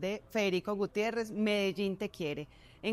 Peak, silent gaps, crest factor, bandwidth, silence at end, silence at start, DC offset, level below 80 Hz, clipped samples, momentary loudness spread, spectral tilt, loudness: -20 dBFS; none; 14 dB; 15.5 kHz; 0 s; 0 s; under 0.1%; -64 dBFS; under 0.1%; 8 LU; -5.5 dB/octave; -34 LUFS